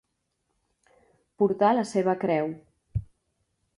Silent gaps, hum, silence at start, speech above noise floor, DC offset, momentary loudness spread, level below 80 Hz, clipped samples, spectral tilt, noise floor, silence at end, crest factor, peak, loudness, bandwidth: none; none; 1.4 s; 53 dB; under 0.1%; 13 LU; -52 dBFS; under 0.1%; -7 dB/octave; -77 dBFS; 0.75 s; 20 dB; -10 dBFS; -26 LUFS; 11 kHz